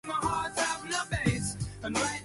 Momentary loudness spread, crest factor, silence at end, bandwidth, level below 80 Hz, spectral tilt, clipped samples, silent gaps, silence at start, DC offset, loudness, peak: 4 LU; 18 dB; 0 s; 12 kHz; -48 dBFS; -3.5 dB/octave; under 0.1%; none; 0.05 s; under 0.1%; -31 LUFS; -12 dBFS